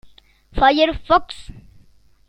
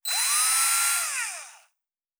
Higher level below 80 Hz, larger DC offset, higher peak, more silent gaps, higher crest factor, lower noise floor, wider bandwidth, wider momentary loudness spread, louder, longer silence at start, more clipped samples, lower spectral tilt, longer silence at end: first, -36 dBFS vs -82 dBFS; neither; first, -2 dBFS vs -10 dBFS; neither; about the same, 18 dB vs 16 dB; second, -52 dBFS vs -82 dBFS; second, 10 kHz vs over 20 kHz; first, 21 LU vs 12 LU; first, -17 LUFS vs -22 LUFS; first, 0.55 s vs 0.05 s; neither; first, -5.5 dB/octave vs 6 dB/octave; about the same, 0.7 s vs 0.65 s